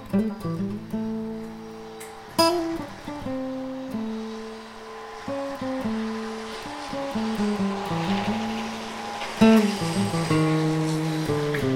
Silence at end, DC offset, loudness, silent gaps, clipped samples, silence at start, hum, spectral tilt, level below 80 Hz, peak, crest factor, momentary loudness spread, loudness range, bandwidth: 0 s; under 0.1%; -26 LUFS; none; under 0.1%; 0 s; none; -6 dB/octave; -52 dBFS; -4 dBFS; 22 dB; 15 LU; 9 LU; 16.5 kHz